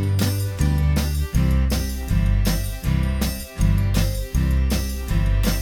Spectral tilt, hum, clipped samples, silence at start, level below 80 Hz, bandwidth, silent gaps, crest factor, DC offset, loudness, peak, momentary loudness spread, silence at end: -5.5 dB/octave; none; under 0.1%; 0 s; -22 dBFS; 19.5 kHz; none; 12 dB; under 0.1%; -22 LUFS; -8 dBFS; 4 LU; 0 s